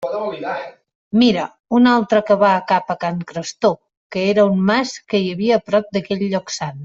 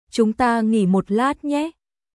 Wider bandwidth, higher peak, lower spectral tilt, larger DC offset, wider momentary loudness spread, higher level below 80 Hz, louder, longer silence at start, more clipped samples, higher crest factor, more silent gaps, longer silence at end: second, 7.8 kHz vs 12 kHz; first, -2 dBFS vs -6 dBFS; about the same, -5.5 dB/octave vs -6.5 dB/octave; neither; first, 12 LU vs 6 LU; about the same, -58 dBFS vs -54 dBFS; about the same, -18 LUFS vs -20 LUFS; second, 0 s vs 0.15 s; neither; about the same, 16 dB vs 14 dB; first, 0.95-1.11 s, 1.60-1.64 s, 3.97-4.10 s vs none; second, 0 s vs 0.45 s